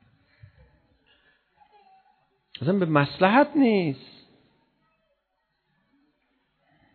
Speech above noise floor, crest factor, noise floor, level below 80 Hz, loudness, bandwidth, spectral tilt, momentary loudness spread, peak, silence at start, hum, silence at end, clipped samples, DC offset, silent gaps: 55 dB; 24 dB; -76 dBFS; -68 dBFS; -22 LUFS; 4.6 kHz; -10 dB/octave; 14 LU; -4 dBFS; 2.6 s; none; 3 s; under 0.1%; under 0.1%; none